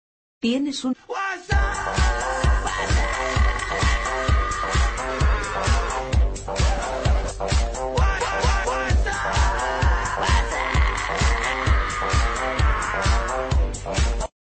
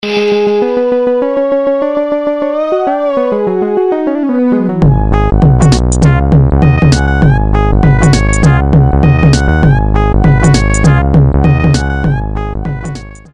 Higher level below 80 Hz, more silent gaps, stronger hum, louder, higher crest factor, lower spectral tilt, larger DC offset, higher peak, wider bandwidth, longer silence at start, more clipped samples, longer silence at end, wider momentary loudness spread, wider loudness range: second, -24 dBFS vs -16 dBFS; neither; neither; second, -23 LUFS vs -10 LUFS; first, 14 dB vs 8 dB; second, -4.5 dB/octave vs -7 dB/octave; neither; second, -8 dBFS vs 0 dBFS; second, 8.8 kHz vs 10.5 kHz; first, 0.45 s vs 0.05 s; second, under 0.1% vs 0.2%; about the same, 0.25 s vs 0.15 s; second, 3 LU vs 6 LU; second, 1 LU vs 4 LU